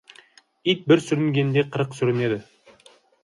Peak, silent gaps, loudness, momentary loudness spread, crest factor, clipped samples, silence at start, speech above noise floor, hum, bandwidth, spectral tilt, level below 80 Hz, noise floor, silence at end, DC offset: -4 dBFS; none; -22 LUFS; 8 LU; 20 dB; under 0.1%; 0.65 s; 34 dB; none; 11.5 kHz; -6.5 dB/octave; -66 dBFS; -55 dBFS; 0.8 s; under 0.1%